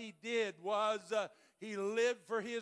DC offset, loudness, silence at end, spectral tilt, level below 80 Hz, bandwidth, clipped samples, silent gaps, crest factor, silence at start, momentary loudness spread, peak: under 0.1%; -37 LUFS; 0 s; -3.5 dB/octave; under -90 dBFS; 11 kHz; under 0.1%; none; 14 dB; 0 s; 10 LU; -22 dBFS